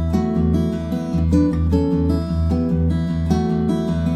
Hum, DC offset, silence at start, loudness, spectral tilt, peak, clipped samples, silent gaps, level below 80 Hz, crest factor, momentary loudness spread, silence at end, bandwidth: none; under 0.1%; 0 s; -19 LUFS; -9 dB/octave; -4 dBFS; under 0.1%; none; -28 dBFS; 14 dB; 4 LU; 0 s; 11.5 kHz